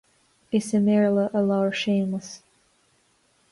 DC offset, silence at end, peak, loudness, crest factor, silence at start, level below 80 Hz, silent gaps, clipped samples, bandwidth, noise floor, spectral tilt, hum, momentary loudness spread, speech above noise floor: under 0.1%; 1.15 s; -12 dBFS; -23 LUFS; 14 dB; 0.5 s; -66 dBFS; none; under 0.1%; 11.5 kHz; -65 dBFS; -6 dB/octave; none; 13 LU; 42 dB